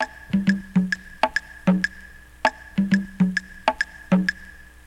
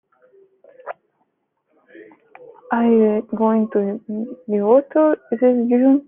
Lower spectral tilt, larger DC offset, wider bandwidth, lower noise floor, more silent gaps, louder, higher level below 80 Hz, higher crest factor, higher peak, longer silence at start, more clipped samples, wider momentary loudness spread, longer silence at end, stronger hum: second, -6.5 dB/octave vs -11.5 dB/octave; neither; first, 11 kHz vs 3.5 kHz; second, -44 dBFS vs -70 dBFS; neither; second, -24 LUFS vs -18 LUFS; first, -48 dBFS vs -68 dBFS; about the same, 20 dB vs 16 dB; about the same, -4 dBFS vs -2 dBFS; second, 0 s vs 0.85 s; neither; second, 5 LU vs 21 LU; first, 0.25 s vs 0.05 s; neither